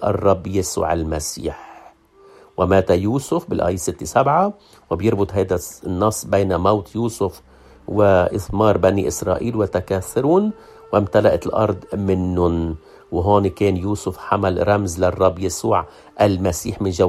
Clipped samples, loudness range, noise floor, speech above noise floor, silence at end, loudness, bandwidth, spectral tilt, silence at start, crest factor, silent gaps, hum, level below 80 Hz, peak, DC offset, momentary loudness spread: under 0.1%; 2 LU; -49 dBFS; 30 dB; 0 s; -19 LUFS; 14.5 kHz; -6 dB/octave; 0 s; 18 dB; none; none; -44 dBFS; 0 dBFS; under 0.1%; 9 LU